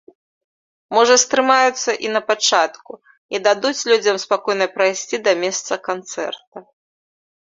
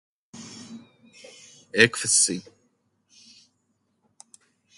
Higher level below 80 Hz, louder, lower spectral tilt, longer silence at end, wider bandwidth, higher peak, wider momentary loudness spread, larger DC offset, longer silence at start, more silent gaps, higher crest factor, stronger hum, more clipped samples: about the same, -68 dBFS vs -66 dBFS; first, -17 LUFS vs -20 LUFS; about the same, -1 dB/octave vs -1.5 dB/octave; second, 0.95 s vs 2.35 s; second, 7.8 kHz vs 11.5 kHz; about the same, -2 dBFS vs 0 dBFS; second, 12 LU vs 26 LU; neither; first, 0.9 s vs 0.35 s; first, 3.18-3.29 s, 6.47-6.52 s vs none; second, 18 dB vs 30 dB; neither; neither